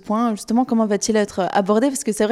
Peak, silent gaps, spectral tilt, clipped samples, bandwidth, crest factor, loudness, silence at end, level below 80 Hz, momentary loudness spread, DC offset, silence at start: -4 dBFS; none; -4.5 dB/octave; under 0.1%; 14.5 kHz; 14 dB; -19 LUFS; 0 s; -56 dBFS; 3 LU; under 0.1%; 0.05 s